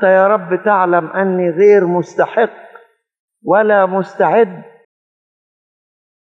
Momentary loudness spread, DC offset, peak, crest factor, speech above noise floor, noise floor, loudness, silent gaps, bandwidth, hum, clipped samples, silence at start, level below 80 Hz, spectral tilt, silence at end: 7 LU; under 0.1%; 0 dBFS; 14 dB; 32 dB; -44 dBFS; -13 LUFS; 3.20-3.28 s; 7.2 kHz; none; under 0.1%; 0 s; -74 dBFS; -7.5 dB/octave; 1.75 s